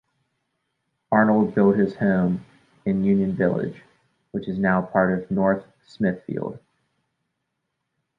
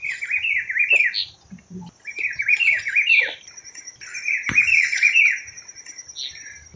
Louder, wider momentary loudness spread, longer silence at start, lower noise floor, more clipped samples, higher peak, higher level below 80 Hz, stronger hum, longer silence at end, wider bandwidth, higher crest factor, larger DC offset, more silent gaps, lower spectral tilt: second, -22 LUFS vs -17 LUFS; second, 12 LU vs 22 LU; first, 1.1 s vs 0 s; first, -78 dBFS vs -43 dBFS; neither; about the same, -2 dBFS vs -4 dBFS; about the same, -56 dBFS vs -60 dBFS; neither; first, 1.6 s vs 0.15 s; second, 5.2 kHz vs 7.6 kHz; about the same, 20 dB vs 18 dB; neither; neither; first, -10 dB/octave vs 0 dB/octave